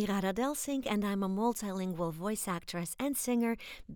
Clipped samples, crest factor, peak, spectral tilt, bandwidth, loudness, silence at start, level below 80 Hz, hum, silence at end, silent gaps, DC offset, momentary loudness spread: under 0.1%; 16 dB; -18 dBFS; -5 dB/octave; over 20 kHz; -34 LUFS; 0 s; -60 dBFS; none; 0 s; none; under 0.1%; 5 LU